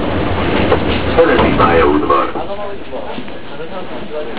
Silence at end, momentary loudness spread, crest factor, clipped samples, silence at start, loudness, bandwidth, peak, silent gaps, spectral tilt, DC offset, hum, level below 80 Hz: 0 s; 16 LU; 16 dB; under 0.1%; 0 s; -13 LUFS; 4 kHz; 0 dBFS; none; -10 dB/octave; 7%; none; -28 dBFS